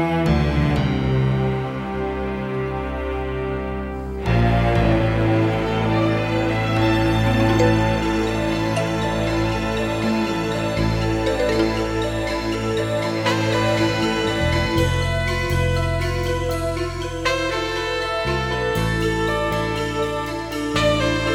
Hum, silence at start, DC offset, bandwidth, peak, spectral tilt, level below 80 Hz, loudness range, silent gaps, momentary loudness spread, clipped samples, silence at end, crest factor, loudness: none; 0 s; under 0.1%; 16.5 kHz; -4 dBFS; -6 dB/octave; -32 dBFS; 3 LU; none; 7 LU; under 0.1%; 0 s; 16 dB; -21 LUFS